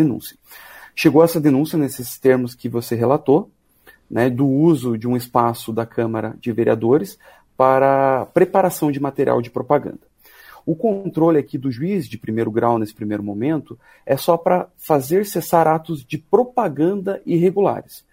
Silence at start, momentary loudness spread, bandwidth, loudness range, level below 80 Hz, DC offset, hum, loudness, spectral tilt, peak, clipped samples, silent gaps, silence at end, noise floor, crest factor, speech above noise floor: 0 s; 10 LU; 16 kHz; 3 LU; -58 dBFS; under 0.1%; none; -19 LUFS; -7 dB/octave; 0 dBFS; under 0.1%; none; 0.15 s; -52 dBFS; 18 dB; 34 dB